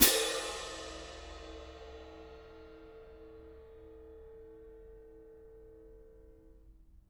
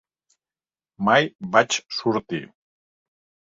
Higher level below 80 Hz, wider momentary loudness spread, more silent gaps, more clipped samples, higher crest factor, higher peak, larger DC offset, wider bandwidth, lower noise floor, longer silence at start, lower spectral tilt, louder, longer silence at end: first, -56 dBFS vs -66 dBFS; first, 19 LU vs 10 LU; second, none vs 1.35-1.39 s; neither; first, 30 dB vs 24 dB; second, -8 dBFS vs -2 dBFS; neither; first, over 20 kHz vs 7.8 kHz; second, -59 dBFS vs under -90 dBFS; second, 0 s vs 1 s; second, -1 dB/octave vs -4 dB/octave; second, -35 LUFS vs -22 LUFS; second, 0.35 s vs 1.05 s